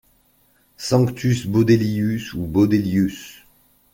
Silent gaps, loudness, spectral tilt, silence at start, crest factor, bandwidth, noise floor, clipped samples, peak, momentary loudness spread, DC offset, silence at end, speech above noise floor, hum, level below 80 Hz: none; -19 LUFS; -7 dB/octave; 0.8 s; 18 dB; 17 kHz; -60 dBFS; under 0.1%; -2 dBFS; 11 LU; under 0.1%; 0.6 s; 41 dB; none; -48 dBFS